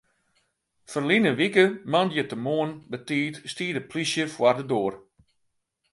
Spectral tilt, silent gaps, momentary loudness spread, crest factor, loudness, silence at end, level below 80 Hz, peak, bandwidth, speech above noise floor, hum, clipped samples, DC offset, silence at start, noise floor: -5 dB/octave; none; 11 LU; 22 dB; -25 LUFS; 0.95 s; -70 dBFS; -4 dBFS; 11.5 kHz; 50 dB; none; under 0.1%; under 0.1%; 0.9 s; -74 dBFS